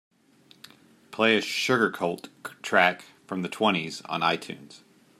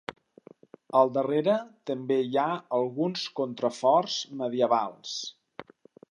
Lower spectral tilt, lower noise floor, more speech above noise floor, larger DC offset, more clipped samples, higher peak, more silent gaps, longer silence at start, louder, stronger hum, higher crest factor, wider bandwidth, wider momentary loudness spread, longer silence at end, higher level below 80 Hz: about the same, -4 dB/octave vs -5 dB/octave; first, -59 dBFS vs -54 dBFS; first, 33 dB vs 28 dB; neither; neither; first, -4 dBFS vs -8 dBFS; neither; first, 1.1 s vs 0.1 s; about the same, -25 LUFS vs -27 LUFS; neither; about the same, 24 dB vs 20 dB; first, 15 kHz vs 10.5 kHz; first, 19 LU vs 12 LU; about the same, 0.4 s vs 0.5 s; about the same, -76 dBFS vs -80 dBFS